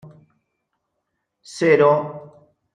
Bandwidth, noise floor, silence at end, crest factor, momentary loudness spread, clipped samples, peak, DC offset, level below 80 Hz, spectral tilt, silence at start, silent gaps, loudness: 10 kHz; -76 dBFS; 0.55 s; 20 dB; 24 LU; under 0.1%; -2 dBFS; under 0.1%; -70 dBFS; -6 dB/octave; 1.5 s; none; -17 LUFS